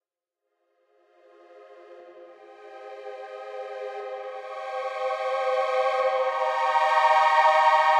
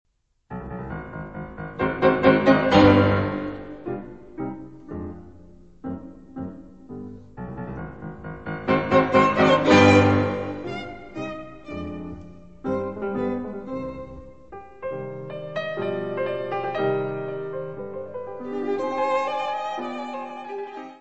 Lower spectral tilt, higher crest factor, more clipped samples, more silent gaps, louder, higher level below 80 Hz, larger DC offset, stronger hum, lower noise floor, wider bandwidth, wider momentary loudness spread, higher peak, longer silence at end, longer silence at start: second, 1 dB/octave vs -6.5 dB/octave; about the same, 18 dB vs 22 dB; neither; neither; about the same, -23 LUFS vs -23 LUFS; second, under -90 dBFS vs -48 dBFS; second, under 0.1% vs 0.3%; neither; first, -85 dBFS vs -49 dBFS; first, 11.5 kHz vs 8.4 kHz; about the same, 21 LU vs 21 LU; second, -8 dBFS vs -2 dBFS; about the same, 0 s vs 0 s; first, 1.55 s vs 0.5 s